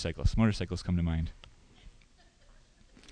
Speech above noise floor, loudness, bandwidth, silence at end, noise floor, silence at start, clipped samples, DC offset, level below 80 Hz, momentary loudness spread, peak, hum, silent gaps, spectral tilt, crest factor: 31 dB; -31 LUFS; 10 kHz; 0 s; -61 dBFS; 0 s; under 0.1%; under 0.1%; -40 dBFS; 8 LU; -14 dBFS; none; none; -7 dB/octave; 20 dB